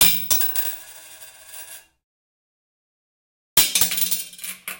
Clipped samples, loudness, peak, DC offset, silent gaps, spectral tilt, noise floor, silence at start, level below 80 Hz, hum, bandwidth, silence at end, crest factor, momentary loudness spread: under 0.1%; -18 LUFS; 0 dBFS; under 0.1%; 2.04-3.56 s; 0.5 dB/octave; -43 dBFS; 0 s; -54 dBFS; none; 17.5 kHz; 0 s; 24 dB; 24 LU